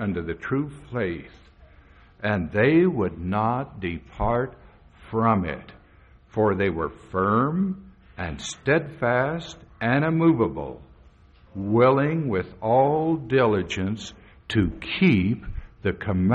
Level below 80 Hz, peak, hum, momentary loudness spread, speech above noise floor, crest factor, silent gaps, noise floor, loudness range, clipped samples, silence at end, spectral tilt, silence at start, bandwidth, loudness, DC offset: -46 dBFS; -8 dBFS; none; 14 LU; 30 dB; 16 dB; none; -53 dBFS; 4 LU; under 0.1%; 0 s; -7 dB/octave; 0 s; 8.4 kHz; -24 LUFS; under 0.1%